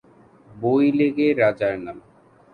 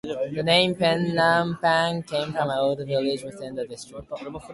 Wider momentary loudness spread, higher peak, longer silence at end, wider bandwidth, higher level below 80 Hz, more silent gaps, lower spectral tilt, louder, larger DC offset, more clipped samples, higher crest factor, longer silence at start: second, 11 LU vs 16 LU; about the same, -6 dBFS vs -4 dBFS; first, 0.55 s vs 0 s; second, 4.9 kHz vs 11.5 kHz; about the same, -60 dBFS vs -58 dBFS; neither; first, -8.5 dB/octave vs -5 dB/octave; first, -20 LUFS vs -23 LUFS; neither; neither; about the same, 16 dB vs 20 dB; first, 0.55 s vs 0.05 s